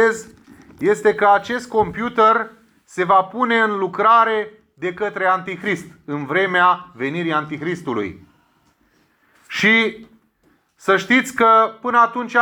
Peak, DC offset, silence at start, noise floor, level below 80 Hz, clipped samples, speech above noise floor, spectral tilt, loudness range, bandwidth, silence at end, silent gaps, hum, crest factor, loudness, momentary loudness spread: -2 dBFS; under 0.1%; 0 s; -61 dBFS; -58 dBFS; under 0.1%; 43 dB; -4.5 dB/octave; 5 LU; 19.5 kHz; 0 s; none; none; 16 dB; -17 LUFS; 13 LU